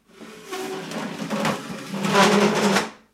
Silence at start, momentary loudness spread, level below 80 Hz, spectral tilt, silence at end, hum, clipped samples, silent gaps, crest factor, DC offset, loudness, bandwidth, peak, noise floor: 0.2 s; 15 LU; -66 dBFS; -4 dB/octave; 0.2 s; none; under 0.1%; none; 20 dB; under 0.1%; -22 LUFS; 16 kHz; -4 dBFS; -43 dBFS